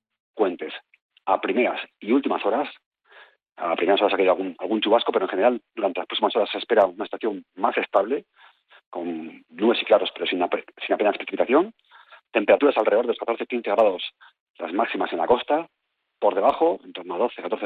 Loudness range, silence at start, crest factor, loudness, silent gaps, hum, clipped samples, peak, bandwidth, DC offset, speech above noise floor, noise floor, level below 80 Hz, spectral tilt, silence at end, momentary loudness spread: 3 LU; 0.35 s; 18 dB; -23 LUFS; 1.02-1.09 s, 2.86-2.91 s, 8.86-8.92 s, 14.40-14.54 s; none; under 0.1%; -6 dBFS; 4.8 kHz; under 0.1%; 30 dB; -53 dBFS; -70 dBFS; -7 dB/octave; 0 s; 12 LU